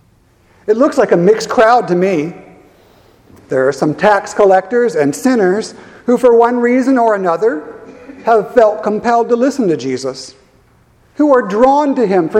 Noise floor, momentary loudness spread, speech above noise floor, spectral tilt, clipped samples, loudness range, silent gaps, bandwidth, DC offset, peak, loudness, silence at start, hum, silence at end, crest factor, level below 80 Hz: -50 dBFS; 11 LU; 39 dB; -6 dB/octave; 0.1%; 3 LU; none; 14 kHz; under 0.1%; 0 dBFS; -12 LUFS; 0.65 s; none; 0 s; 12 dB; -52 dBFS